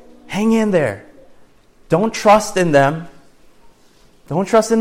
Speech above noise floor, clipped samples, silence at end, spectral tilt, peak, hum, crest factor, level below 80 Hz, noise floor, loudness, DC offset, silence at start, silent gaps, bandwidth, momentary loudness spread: 35 dB; under 0.1%; 0 s; -5.5 dB/octave; -2 dBFS; none; 16 dB; -48 dBFS; -49 dBFS; -16 LUFS; under 0.1%; 0.3 s; none; 16 kHz; 12 LU